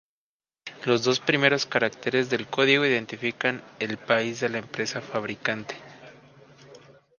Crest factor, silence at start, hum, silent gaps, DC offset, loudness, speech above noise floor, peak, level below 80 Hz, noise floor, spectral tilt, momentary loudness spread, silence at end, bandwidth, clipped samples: 24 dB; 0.65 s; none; none; under 0.1%; -25 LUFS; over 65 dB; -2 dBFS; -70 dBFS; under -90 dBFS; -4 dB/octave; 12 LU; 0.4 s; 10 kHz; under 0.1%